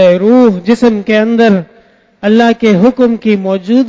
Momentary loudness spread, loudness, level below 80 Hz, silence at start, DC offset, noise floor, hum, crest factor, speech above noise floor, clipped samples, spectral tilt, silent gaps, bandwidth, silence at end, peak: 5 LU; -9 LUFS; -48 dBFS; 0 s; under 0.1%; -45 dBFS; none; 8 dB; 37 dB; 0.5%; -7 dB/octave; none; 7.8 kHz; 0 s; 0 dBFS